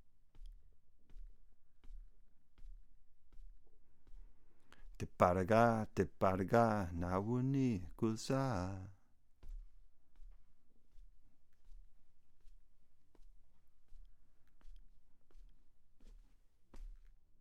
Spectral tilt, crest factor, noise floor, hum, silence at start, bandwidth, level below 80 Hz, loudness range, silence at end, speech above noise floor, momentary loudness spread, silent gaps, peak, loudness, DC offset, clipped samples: -7.5 dB/octave; 26 dB; -64 dBFS; none; 0 s; 16 kHz; -58 dBFS; 11 LU; 0 s; 28 dB; 23 LU; none; -16 dBFS; -36 LUFS; under 0.1%; under 0.1%